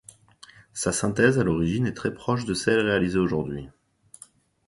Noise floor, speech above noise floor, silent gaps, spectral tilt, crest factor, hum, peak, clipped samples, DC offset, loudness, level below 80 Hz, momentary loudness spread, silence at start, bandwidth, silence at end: -53 dBFS; 30 dB; none; -5 dB/octave; 22 dB; none; -4 dBFS; under 0.1%; under 0.1%; -24 LUFS; -48 dBFS; 9 LU; 0.75 s; 11.5 kHz; 1 s